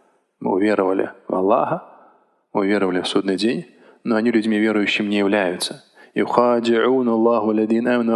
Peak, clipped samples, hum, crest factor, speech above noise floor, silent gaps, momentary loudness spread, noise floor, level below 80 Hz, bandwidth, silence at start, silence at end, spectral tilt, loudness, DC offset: 0 dBFS; under 0.1%; none; 20 dB; 36 dB; none; 9 LU; -55 dBFS; -66 dBFS; 12.5 kHz; 0.4 s; 0 s; -5.5 dB/octave; -19 LUFS; under 0.1%